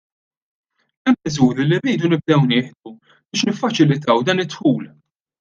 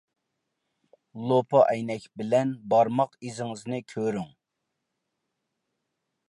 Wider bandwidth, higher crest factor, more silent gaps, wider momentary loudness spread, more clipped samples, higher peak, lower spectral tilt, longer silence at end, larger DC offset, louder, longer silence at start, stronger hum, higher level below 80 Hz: second, 7.6 kHz vs 11.5 kHz; about the same, 18 dB vs 22 dB; neither; second, 8 LU vs 13 LU; neither; first, -2 dBFS vs -8 dBFS; about the same, -6 dB/octave vs -6.5 dB/octave; second, 0.55 s vs 2 s; neither; first, -18 LUFS vs -26 LUFS; about the same, 1.05 s vs 1.15 s; neither; first, -60 dBFS vs -72 dBFS